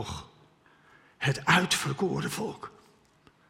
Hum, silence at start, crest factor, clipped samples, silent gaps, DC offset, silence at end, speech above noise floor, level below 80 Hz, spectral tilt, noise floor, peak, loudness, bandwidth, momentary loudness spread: none; 0 s; 24 dB; under 0.1%; none; under 0.1%; 0.8 s; 33 dB; -62 dBFS; -4 dB/octave; -62 dBFS; -8 dBFS; -28 LUFS; 16 kHz; 20 LU